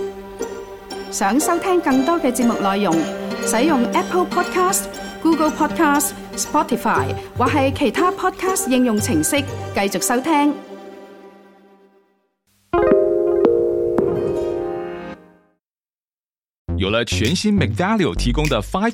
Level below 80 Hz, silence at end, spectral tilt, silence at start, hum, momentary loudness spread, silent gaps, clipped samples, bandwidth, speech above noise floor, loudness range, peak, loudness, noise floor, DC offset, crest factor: -38 dBFS; 0 s; -4.5 dB/octave; 0 s; none; 13 LU; 15.95-15.99 s, 16.13-16.17 s, 16.58-16.65 s; under 0.1%; 17 kHz; over 72 dB; 5 LU; -2 dBFS; -18 LUFS; under -90 dBFS; under 0.1%; 18 dB